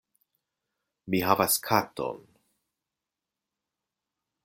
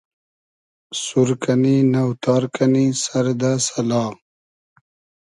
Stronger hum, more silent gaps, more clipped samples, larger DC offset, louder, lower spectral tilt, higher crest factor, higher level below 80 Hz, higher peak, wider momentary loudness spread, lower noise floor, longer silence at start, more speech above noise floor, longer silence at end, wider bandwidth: neither; neither; neither; neither; second, -26 LUFS vs -19 LUFS; second, -3.5 dB/octave vs -5.5 dB/octave; first, 26 dB vs 16 dB; second, -68 dBFS vs -62 dBFS; about the same, -6 dBFS vs -4 dBFS; first, 12 LU vs 6 LU; about the same, -88 dBFS vs under -90 dBFS; first, 1.05 s vs 0.9 s; second, 62 dB vs over 72 dB; first, 2.25 s vs 1.1 s; first, 16.5 kHz vs 11.5 kHz